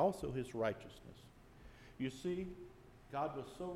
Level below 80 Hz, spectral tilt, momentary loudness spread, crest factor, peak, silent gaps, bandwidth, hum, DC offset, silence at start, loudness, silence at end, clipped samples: -62 dBFS; -6.5 dB/octave; 21 LU; 20 dB; -22 dBFS; none; 16 kHz; none; under 0.1%; 0 s; -43 LUFS; 0 s; under 0.1%